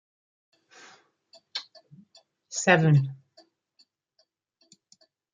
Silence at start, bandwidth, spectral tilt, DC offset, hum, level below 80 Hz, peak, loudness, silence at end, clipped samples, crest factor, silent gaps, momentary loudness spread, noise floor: 1.55 s; 9.4 kHz; -5.5 dB/octave; under 0.1%; none; -74 dBFS; -4 dBFS; -24 LUFS; 2.2 s; under 0.1%; 26 dB; none; 18 LU; -72 dBFS